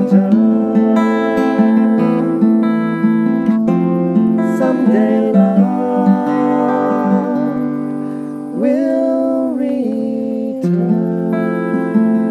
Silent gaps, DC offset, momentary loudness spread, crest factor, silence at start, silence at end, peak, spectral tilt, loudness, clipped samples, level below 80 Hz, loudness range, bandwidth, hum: none; under 0.1%; 7 LU; 14 dB; 0 s; 0 s; 0 dBFS; -9.5 dB/octave; -14 LUFS; under 0.1%; -60 dBFS; 3 LU; 7.4 kHz; none